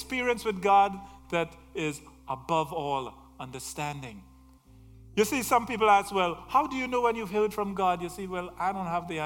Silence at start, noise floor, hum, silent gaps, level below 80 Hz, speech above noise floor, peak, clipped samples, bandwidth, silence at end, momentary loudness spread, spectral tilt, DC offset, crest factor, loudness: 0 s; -55 dBFS; none; none; -56 dBFS; 27 dB; -8 dBFS; under 0.1%; 18 kHz; 0 s; 16 LU; -4.5 dB/octave; under 0.1%; 20 dB; -28 LUFS